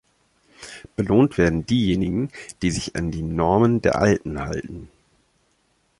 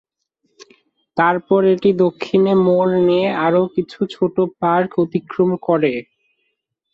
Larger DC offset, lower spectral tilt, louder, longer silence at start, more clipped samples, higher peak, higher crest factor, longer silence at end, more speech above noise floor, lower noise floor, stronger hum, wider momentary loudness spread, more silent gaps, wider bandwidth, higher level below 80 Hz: neither; second, -6.5 dB/octave vs -8.5 dB/octave; second, -21 LUFS vs -17 LUFS; about the same, 0.6 s vs 0.6 s; neither; about the same, -4 dBFS vs -2 dBFS; about the same, 18 dB vs 14 dB; first, 1.15 s vs 0.9 s; second, 45 dB vs 56 dB; second, -66 dBFS vs -72 dBFS; neither; first, 18 LU vs 7 LU; neither; first, 11.5 kHz vs 7 kHz; first, -40 dBFS vs -60 dBFS